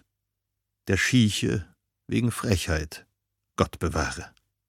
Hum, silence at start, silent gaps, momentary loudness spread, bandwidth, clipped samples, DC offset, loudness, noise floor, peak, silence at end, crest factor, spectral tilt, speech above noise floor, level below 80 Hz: none; 0.85 s; none; 18 LU; 16.5 kHz; under 0.1%; under 0.1%; -26 LUFS; -82 dBFS; -6 dBFS; 0.4 s; 22 dB; -5 dB/octave; 57 dB; -42 dBFS